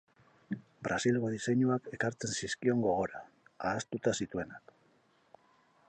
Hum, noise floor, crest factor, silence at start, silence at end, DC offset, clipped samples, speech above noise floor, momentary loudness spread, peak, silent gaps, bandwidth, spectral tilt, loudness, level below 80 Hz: none; -69 dBFS; 18 dB; 0.5 s; 1.3 s; under 0.1%; under 0.1%; 36 dB; 13 LU; -16 dBFS; none; 9.4 kHz; -5 dB/octave; -34 LUFS; -66 dBFS